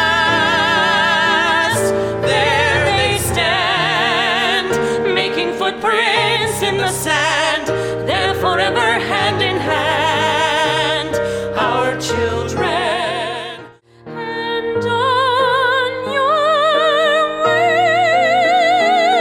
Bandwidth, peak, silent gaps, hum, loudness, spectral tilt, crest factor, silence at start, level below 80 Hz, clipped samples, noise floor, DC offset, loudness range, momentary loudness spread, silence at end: 16.5 kHz; -4 dBFS; none; none; -15 LUFS; -3.5 dB/octave; 12 dB; 0 s; -44 dBFS; under 0.1%; -39 dBFS; under 0.1%; 5 LU; 6 LU; 0 s